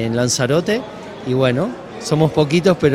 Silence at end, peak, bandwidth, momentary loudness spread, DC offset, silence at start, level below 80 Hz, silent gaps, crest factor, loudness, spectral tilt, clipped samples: 0 s; 0 dBFS; 15.5 kHz; 12 LU; under 0.1%; 0 s; -48 dBFS; none; 16 dB; -17 LUFS; -5.5 dB/octave; under 0.1%